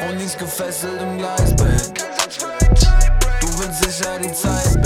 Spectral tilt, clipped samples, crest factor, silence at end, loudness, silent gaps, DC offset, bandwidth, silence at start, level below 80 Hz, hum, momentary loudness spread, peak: -4 dB/octave; under 0.1%; 14 dB; 0 s; -19 LUFS; none; under 0.1%; 16 kHz; 0 s; -18 dBFS; none; 9 LU; -2 dBFS